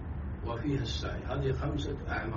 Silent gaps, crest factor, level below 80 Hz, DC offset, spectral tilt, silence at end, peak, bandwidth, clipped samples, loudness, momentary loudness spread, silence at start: none; 14 dB; -40 dBFS; under 0.1%; -5.5 dB/octave; 0 s; -20 dBFS; 7.2 kHz; under 0.1%; -35 LUFS; 5 LU; 0 s